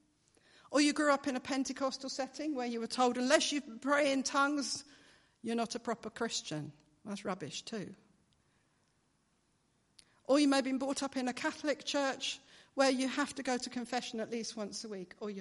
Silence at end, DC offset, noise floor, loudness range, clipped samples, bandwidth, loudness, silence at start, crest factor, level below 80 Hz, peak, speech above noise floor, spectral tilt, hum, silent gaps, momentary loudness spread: 0 s; under 0.1%; -75 dBFS; 10 LU; under 0.1%; 11.5 kHz; -34 LUFS; 0.7 s; 26 dB; -76 dBFS; -10 dBFS; 41 dB; -3 dB/octave; none; none; 14 LU